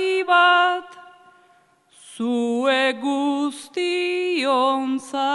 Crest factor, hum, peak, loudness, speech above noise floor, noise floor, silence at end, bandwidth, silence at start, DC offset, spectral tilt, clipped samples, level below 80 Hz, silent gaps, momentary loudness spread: 16 dB; none; -6 dBFS; -20 LUFS; 36 dB; -58 dBFS; 0 s; 11.5 kHz; 0 s; under 0.1%; -3 dB/octave; under 0.1%; -80 dBFS; none; 10 LU